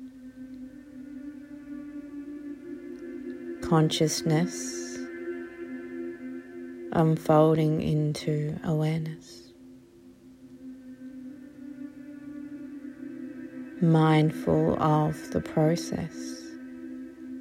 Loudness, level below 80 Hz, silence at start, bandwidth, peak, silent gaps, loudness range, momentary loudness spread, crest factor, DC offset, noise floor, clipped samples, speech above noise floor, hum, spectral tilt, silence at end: -27 LUFS; -60 dBFS; 0 s; 16 kHz; -10 dBFS; none; 16 LU; 21 LU; 20 dB; under 0.1%; -52 dBFS; under 0.1%; 28 dB; none; -6.5 dB/octave; 0 s